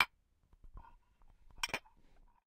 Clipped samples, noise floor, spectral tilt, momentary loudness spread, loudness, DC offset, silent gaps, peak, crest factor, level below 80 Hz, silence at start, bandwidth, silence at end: under 0.1%; -70 dBFS; -1 dB/octave; 23 LU; -40 LUFS; under 0.1%; none; -12 dBFS; 32 dB; -60 dBFS; 0 s; 16 kHz; 0.65 s